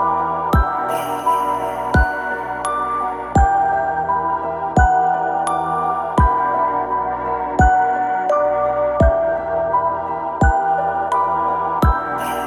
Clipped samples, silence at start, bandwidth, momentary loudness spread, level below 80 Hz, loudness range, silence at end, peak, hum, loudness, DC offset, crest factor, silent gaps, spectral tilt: under 0.1%; 0 s; 14.5 kHz; 6 LU; -26 dBFS; 2 LU; 0 s; -2 dBFS; none; -18 LUFS; under 0.1%; 16 dB; none; -6.5 dB/octave